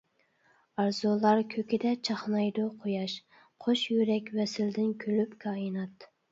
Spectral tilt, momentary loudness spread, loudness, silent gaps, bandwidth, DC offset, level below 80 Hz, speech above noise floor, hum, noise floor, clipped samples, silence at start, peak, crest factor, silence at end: -6 dB/octave; 9 LU; -30 LUFS; none; 7.8 kHz; under 0.1%; -78 dBFS; 39 dB; none; -69 dBFS; under 0.1%; 0.8 s; -12 dBFS; 20 dB; 0.25 s